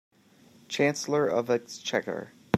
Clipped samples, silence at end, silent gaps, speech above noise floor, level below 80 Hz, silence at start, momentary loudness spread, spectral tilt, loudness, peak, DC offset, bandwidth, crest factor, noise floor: under 0.1%; 0 s; none; 30 dB; -74 dBFS; 0.7 s; 10 LU; -4.5 dB/octave; -28 LUFS; -8 dBFS; under 0.1%; 14.5 kHz; 20 dB; -58 dBFS